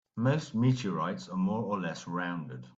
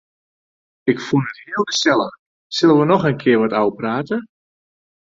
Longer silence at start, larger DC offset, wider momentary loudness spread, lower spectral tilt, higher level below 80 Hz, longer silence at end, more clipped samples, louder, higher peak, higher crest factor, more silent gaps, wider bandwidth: second, 0.15 s vs 0.85 s; neither; second, 7 LU vs 11 LU; first, -7 dB/octave vs -5 dB/octave; second, -68 dBFS vs -60 dBFS; second, 0.05 s vs 0.85 s; neither; second, -32 LUFS vs -18 LUFS; second, -14 dBFS vs -2 dBFS; about the same, 16 dB vs 18 dB; second, none vs 2.19-2.50 s; about the same, 7.8 kHz vs 7.8 kHz